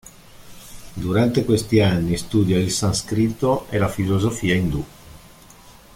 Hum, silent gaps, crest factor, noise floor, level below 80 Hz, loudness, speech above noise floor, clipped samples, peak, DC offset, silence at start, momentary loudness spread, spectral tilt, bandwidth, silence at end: none; none; 16 dB; -46 dBFS; -42 dBFS; -20 LUFS; 27 dB; under 0.1%; -4 dBFS; under 0.1%; 0.05 s; 12 LU; -5.5 dB/octave; 16.5 kHz; 0.25 s